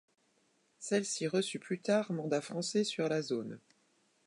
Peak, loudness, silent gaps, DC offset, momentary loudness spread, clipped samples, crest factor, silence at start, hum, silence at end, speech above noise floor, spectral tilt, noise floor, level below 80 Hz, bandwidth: -18 dBFS; -34 LUFS; none; under 0.1%; 7 LU; under 0.1%; 18 dB; 0.8 s; none; 0.7 s; 39 dB; -4.5 dB/octave; -73 dBFS; -86 dBFS; 11.5 kHz